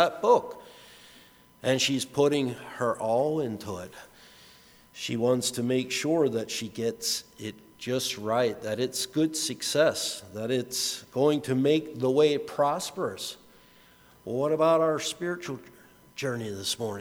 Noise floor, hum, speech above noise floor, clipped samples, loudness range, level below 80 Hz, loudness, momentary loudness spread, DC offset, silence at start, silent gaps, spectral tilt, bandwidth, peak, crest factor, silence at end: -57 dBFS; none; 29 dB; under 0.1%; 3 LU; -68 dBFS; -27 LUFS; 14 LU; under 0.1%; 0 s; none; -4 dB/octave; over 20 kHz; -8 dBFS; 22 dB; 0 s